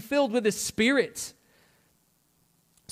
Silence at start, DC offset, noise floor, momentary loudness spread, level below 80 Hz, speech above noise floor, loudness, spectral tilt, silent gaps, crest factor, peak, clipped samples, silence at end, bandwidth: 0 s; under 0.1%; -68 dBFS; 13 LU; -66 dBFS; 42 dB; -26 LUFS; -3 dB/octave; none; 18 dB; -10 dBFS; under 0.1%; 1.6 s; 16.5 kHz